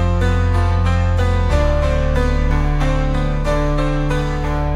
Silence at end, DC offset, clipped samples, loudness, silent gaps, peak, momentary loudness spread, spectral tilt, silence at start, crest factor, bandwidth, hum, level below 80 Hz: 0 s; under 0.1%; under 0.1%; -18 LUFS; none; -4 dBFS; 3 LU; -7 dB/octave; 0 s; 12 dB; 10 kHz; none; -18 dBFS